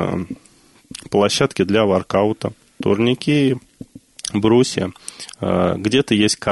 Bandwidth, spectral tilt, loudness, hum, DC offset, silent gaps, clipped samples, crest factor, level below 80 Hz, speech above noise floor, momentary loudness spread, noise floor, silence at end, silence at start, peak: 12 kHz; -5 dB/octave; -18 LUFS; none; under 0.1%; none; under 0.1%; 16 dB; -50 dBFS; 27 dB; 16 LU; -45 dBFS; 0 s; 0 s; -2 dBFS